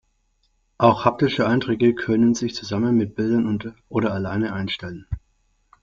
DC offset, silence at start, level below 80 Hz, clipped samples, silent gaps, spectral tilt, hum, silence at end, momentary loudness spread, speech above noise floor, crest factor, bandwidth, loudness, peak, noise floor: under 0.1%; 0.8 s; -48 dBFS; under 0.1%; none; -6.5 dB/octave; none; 0.65 s; 11 LU; 46 dB; 20 dB; 7.4 kHz; -21 LUFS; -2 dBFS; -66 dBFS